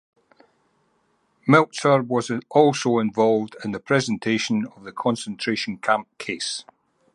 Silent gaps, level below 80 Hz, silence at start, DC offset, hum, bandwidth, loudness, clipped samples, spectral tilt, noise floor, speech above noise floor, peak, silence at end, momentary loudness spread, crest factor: none; -66 dBFS; 1.45 s; under 0.1%; none; 11.5 kHz; -22 LUFS; under 0.1%; -5 dB/octave; -67 dBFS; 45 dB; 0 dBFS; 0.55 s; 12 LU; 22 dB